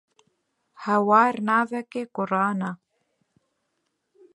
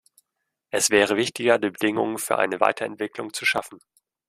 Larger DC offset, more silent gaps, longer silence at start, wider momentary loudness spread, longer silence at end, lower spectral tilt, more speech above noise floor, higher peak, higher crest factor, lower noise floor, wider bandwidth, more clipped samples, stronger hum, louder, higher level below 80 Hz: neither; neither; about the same, 0.8 s vs 0.75 s; first, 14 LU vs 11 LU; first, 1.6 s vs 0.5 s; first, -7 dB/octave vs -2.5 dB/octave; second, 54 dB vs 58 dB; about the same, -4 dBFS vs -2 dBFS; about the same, 22 dB vs 22 dB; second, -76 dBFS vs -81 dBFS; second, 11.5 kHz vs 15.5 kHz; neither; neither; about the same, -23 LUFS vs -23 LUFS; second, -78 dBFS vs -66 dBFS